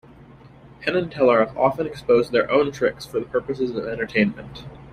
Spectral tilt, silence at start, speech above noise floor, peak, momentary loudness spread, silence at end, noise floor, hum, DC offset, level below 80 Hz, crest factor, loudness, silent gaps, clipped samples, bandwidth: -6.5 dB/octave; 0.45 s; 25 dB; -4 dBFS; 10 LU; 0 s; -46 dBFS; none; under 0.1%; -52 dBFS; 18 dB; -22 LUFS; none; under 0.1%; 13.5 kHz